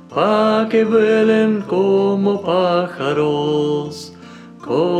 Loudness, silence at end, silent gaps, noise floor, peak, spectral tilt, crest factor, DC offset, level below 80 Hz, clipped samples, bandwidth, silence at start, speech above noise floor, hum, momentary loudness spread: -16 LUFS; 0 s; none; -38 dBFS; -4 dBFS; -7 dB/octave; 12 dB; under 0.1%; -62 dBFS; under 0.1%; 9.8 kHz; 0.1 s; 22 dB; none; 9 LU